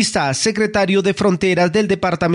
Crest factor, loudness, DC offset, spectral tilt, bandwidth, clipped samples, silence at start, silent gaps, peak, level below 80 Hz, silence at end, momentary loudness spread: 10 dB; -16 LUFS; under 0.1%; -4.5 dB/octave; 11 kHz; under 0.1%; 0 s; none; -6 dBFS; -46 dBFS; 0 s; 2 LU